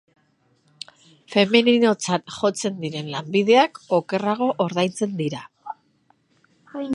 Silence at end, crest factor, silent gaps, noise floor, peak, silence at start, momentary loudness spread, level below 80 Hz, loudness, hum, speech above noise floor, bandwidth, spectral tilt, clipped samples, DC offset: 0 s; 22 dB; none; -64 dBFS; -2 dBFS; 1.3 s; 22 LU; -70 dBFS; -21 LUFS; none; 43 dB; 11.5 kHz; -4.5 dB/octave; under 0.1%; under 0.1%